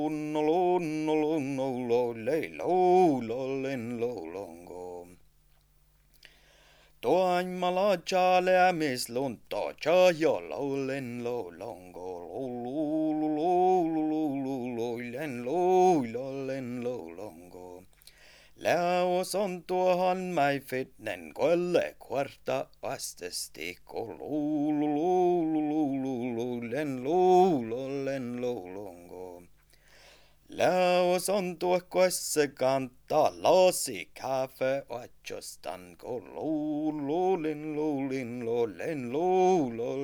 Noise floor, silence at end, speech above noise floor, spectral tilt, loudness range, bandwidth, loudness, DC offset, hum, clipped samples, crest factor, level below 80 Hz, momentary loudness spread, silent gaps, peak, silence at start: -64 dBFS; 0 s; 36 dB; -5 dB/octave; 6 LU; over 20 kHz; -29 LUFS; under 0.1%; none; under 0.1%; 20 dB; -66 dBFS; 16 LU; none; -10 dBFS; 0 s